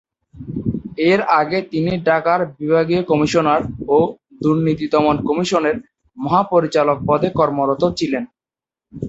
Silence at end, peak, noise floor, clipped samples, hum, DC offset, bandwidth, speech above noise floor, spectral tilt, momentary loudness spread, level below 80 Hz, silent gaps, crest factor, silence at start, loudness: 0 s; -2 dBFS; under -90 dBFS; under 0.1%; none; under 0.1%; 8 kHz; over 74 dB; -6.5 dB/octave; 9 LU; -46 dBFS; none; 16 dB; 0.35 s; -17 LUFS